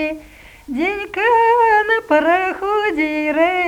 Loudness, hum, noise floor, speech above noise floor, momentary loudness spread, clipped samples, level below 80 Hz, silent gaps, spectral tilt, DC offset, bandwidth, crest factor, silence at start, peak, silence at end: -16 LUFS; none; -41 dBFS; 25 dB; 9 LU; under 0.1%; -48 dBFS; none; -4.5 dB/octave; under 0.1%; 19 kHz; 16 dB; 0 s; 0 dBFS; 0 s